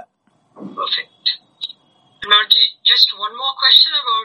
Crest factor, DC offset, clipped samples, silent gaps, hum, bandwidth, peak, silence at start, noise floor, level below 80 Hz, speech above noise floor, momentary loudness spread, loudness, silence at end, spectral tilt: 18 dB; under 0.1%; under 0.1%; none; none; 11.5 kHz; 0 dBFS; 0.6 s; -61 dBFS; -66 dBFS; 45 dB; 20 LU; -12 LUFS; 0 s; -0.5 dB/octave